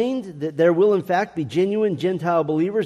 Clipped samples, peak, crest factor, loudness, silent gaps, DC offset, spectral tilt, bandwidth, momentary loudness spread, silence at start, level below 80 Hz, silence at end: under 0.1%; -6 dBFS; 14 dB; -21 LUFS; none; under 0.1%; -7.5 dB/octave; 13 kHz; 7 LU; 0 s; -64 dBFS; 0 s